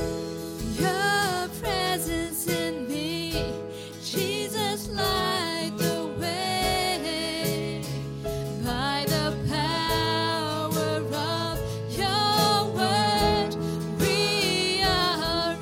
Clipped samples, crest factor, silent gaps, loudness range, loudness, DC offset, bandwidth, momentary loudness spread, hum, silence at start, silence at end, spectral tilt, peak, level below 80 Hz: under 0.1%; 18 dB; none; 5 LU; -26 LUFS; under 0.1%; 16.5 kHz; 9 LU; none; 0 s; 0 s; -4 dB/octave; -8 dBFS; -44 dBFS